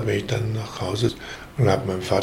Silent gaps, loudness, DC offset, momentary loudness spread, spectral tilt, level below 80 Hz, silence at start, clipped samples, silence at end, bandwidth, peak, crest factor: none; -24 LUFS; under 0.1%; 8 LU; -6 dB/octave; -48 dBFS; 0 s; under 0.1%; 0 s; 16.5 kHz; -4 dBFS; 18 dB